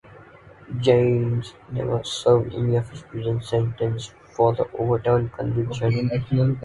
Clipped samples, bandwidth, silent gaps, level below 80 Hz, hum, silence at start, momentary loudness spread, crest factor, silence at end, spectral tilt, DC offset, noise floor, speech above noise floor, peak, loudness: under 0.1%; 11.5 kHz; none; -48 dBFS; none; 0.1 s; 10 LU; 18 dB; 0 s; -7.5 dB/octave; under 0.1%; -47 dBFS; 25 dB; -4 dBFS; -23 LUFS